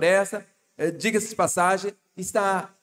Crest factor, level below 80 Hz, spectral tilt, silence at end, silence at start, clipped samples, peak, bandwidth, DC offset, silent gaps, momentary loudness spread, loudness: 16 dB; -70 dBFS; -3.5 dB/octave; 0.15 s; 0 s; under 0.1%; -8 dBFS; 16.5 kHz; under 0.1%; none; 12 LU; -24 LUFS